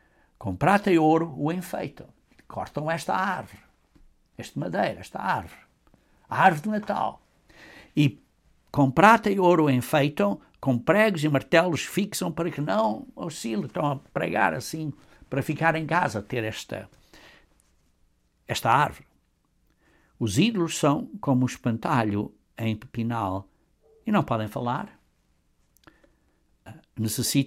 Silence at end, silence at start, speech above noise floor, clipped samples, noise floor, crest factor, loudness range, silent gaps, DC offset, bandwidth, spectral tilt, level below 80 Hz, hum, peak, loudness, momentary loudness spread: 0 s; 0.4 s; 43 dB; under 0.1%; -68 dBFS; 24 dB; 9 LU; none; under 0.1%; 16.5 kHz; -5.5 dB/octave; -58 dBFS; none; -2 dBFS; -25 LUFS; 14 LU